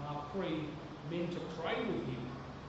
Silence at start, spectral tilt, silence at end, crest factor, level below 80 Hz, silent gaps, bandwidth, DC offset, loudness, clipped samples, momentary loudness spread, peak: 0 s; -5 dB/octave; 0 s; 16 dB; -60 dBFS; none; 8 kHz; under 0.1%; -40 LUFS; under 0.1%; 7 LU; -24 dBFS